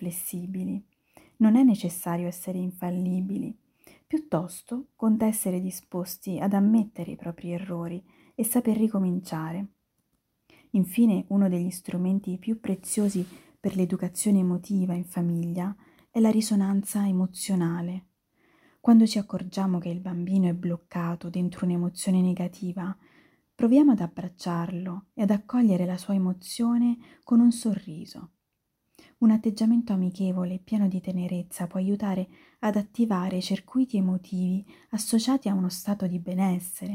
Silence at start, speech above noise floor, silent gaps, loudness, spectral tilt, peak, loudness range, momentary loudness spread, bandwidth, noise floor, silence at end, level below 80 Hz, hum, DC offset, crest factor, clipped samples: 0 s; 53 dB; none; -27 LUFS; -6.5 dB/octave; -10 dBFS; 4 LU; 12 LU; 16 kHz; -79 dBFS; 0 s; -66 dBFS; none; under 0.1%; 16 dB; under 0.1%